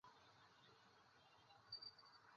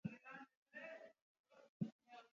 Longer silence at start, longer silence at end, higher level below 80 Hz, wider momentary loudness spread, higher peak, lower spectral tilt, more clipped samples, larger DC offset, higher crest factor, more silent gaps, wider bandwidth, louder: about the same, 0.05 s vs 0.05 s; about the same, 0 s vs 0.05 s; about the same, under -90 dBFS vs -88 dBFS; first, 14 LU vs 11 LU; second, -44 dBFS vs -32 dBFS; second, 0 dB/octave vs -6.5 dB/octave; neither; neither; about the same, 20 dB vs 24 dB; second, none vs 0.57-0.66 s, 1.22-1.44 s, 1.69-1.80 s, 1.92-1.99 s; about the same, 7 kHz vs 7.2 kHz; second, -61 LUFS vs -54 LUFS